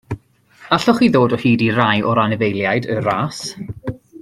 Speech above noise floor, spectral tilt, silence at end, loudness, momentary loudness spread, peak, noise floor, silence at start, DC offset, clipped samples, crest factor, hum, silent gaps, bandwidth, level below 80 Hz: 30 dB; -6 dB/octave; 0.05 s; -16 LUFS; 15 LU; 0 dBFS; -46 dBFS; 0.1 s; under 0.1%; under 0.1%; 16 dB; none; none; 13 kHz; -50 dBFS